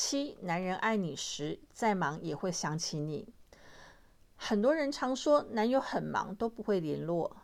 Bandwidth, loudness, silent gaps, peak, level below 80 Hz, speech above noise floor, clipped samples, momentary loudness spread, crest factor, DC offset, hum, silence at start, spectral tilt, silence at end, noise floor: 15 kHz; -33 LUFS; none; -16 dBFS; -64 dBFS; 27 dB; under 0.1%; 8 LU; 16 dB; under 0.1%; none; 0 s; -4.5 dB/octave; 0.05 s; -60 dBFS